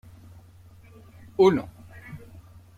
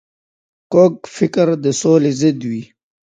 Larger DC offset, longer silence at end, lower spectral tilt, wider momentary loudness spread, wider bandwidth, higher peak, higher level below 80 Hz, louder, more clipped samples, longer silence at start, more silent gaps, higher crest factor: neither; first, 0.6 s vs 0.4 s; about the same, -7 dB/octave vs -6 dB/octave; first, 24 LU vs 10 LU; about the same, 9.4 kHz vs 9.4 kHz; second, -8 dBFS vs 0 dBFS; about the same, -58 dBFS vs -62 dBFS; second, -23 LUFS vs -15 LUFS; neither; first, 1.4 s vs 0.7 s; neither; first, 22 dB vs 16 dB